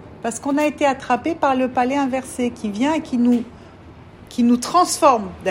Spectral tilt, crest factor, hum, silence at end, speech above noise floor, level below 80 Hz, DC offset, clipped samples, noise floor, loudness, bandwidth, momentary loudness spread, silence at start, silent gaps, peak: -4 dB/octave; 18 dB; none; 0 s; 23 dB; -52 dBFS; under 0.1%; under 0.1%; -42 dBFS; -19 LUFS; 16 kHz; 8 LU; 0 s; none; -2 dBFS